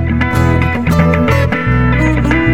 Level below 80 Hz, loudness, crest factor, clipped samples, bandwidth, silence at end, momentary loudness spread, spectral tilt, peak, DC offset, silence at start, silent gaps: -20 dBFS; -12 LUFS; 10 dB; under 0.1%; 15.5 kHz; 0 s; 2 LU; -7.5 dB/octave; 0 dBFS; 3%; 0 s; none